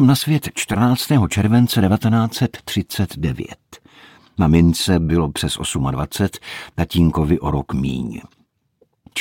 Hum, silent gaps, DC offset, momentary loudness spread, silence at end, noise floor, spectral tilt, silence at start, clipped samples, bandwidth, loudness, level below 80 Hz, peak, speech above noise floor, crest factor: none; none; under 0.1%; 12 LU; 0 s; -61 dBFS; -6 dB/octave; 0 s; under 0.1%; 17 kHz; -18 LUFS; -38 dBFS; -2 dBFS; 44 dB; 16 dB